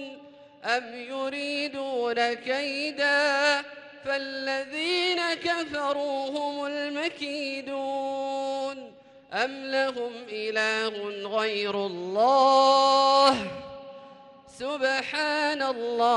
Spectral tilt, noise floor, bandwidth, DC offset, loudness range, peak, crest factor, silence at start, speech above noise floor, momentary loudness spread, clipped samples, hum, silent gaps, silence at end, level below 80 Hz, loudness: -2.5 dB/octave; -50 dBFS; 11.5 kHz; under 0.1%; 8 LU; -10 dBFS; 18 dB; 0 s; 24 dB; 15 LU; under 0.1%; none; none; 0 s; -70 dBFS; -26 LUFS